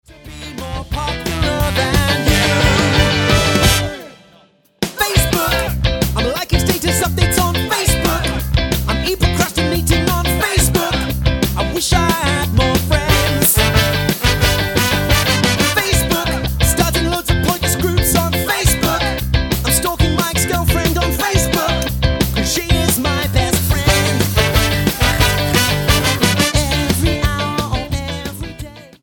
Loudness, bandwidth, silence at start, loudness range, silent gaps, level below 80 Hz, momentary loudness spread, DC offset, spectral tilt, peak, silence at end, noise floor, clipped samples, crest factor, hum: -15 LUFS; 17.5 kHz; 0.1 s; 2 LU; none; -22 dBFS; 6 LU; under 0.1%; -4 dB/octave; 0 dBFS; 0.15 s; -50 dBFS; under 0.1%; 16 dB; none